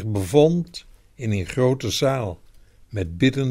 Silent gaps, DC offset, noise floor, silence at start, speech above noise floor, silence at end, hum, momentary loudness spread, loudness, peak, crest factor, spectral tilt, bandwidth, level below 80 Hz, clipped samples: none; under 0.1%; -47 dBFS; 0 s; 26 dB; 0 s; none; 17 LU; -22 LUFS; -4 dBFS; 18 dB; -6 dB/octave; 16 kHz; -46 dBFS; under 0.1%